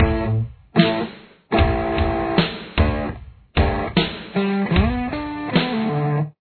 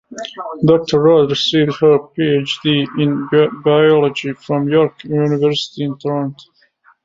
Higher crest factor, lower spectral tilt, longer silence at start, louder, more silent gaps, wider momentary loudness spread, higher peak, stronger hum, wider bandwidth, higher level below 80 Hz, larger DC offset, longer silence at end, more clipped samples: about the same, 20 dB vs 16 dB; first, -10 dB/octave vs -6.5 dB/octave; about the same, 0 s vs 0.1 s; second, -21 LUFS vs -15 LUFS; neither; second, 7 LU vs 10 LU; about the same, 0 dBFS vs 0 dBFS; neither; second, 4.6 kHz vs 7.6 kHz; first, -28 dBFS vs -56 dBFS; neither; second, 0.1 s vs 0.65 s; neither